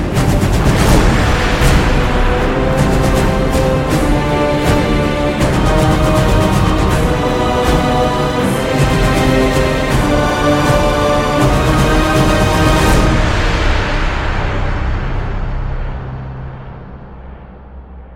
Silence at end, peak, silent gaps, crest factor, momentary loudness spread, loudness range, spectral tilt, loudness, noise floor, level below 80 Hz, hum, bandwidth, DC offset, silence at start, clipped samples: 0 s; 0 dBFS; none; 12 dB; 10 LU; 7 LU; -5.5 dB/octave; -13 LUFS; -33 dBFS; -18 dBFS; none; 16.5 kHz; under 0.1%; 0 s; under 0.1%